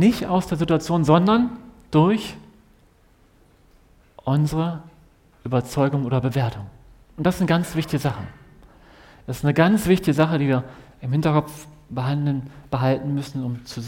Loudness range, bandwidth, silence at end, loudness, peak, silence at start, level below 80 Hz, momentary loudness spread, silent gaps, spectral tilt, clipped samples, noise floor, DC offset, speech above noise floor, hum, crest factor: 5 LU; 17 kHz; 0 s; -22 LUFS; -2 dBFS; 0 s; -48 dBFS; 17 LU; none; -7 dB/octave; under 0.1%; -56 dBFS; under 0.1%; 35 dB; none; 20 dB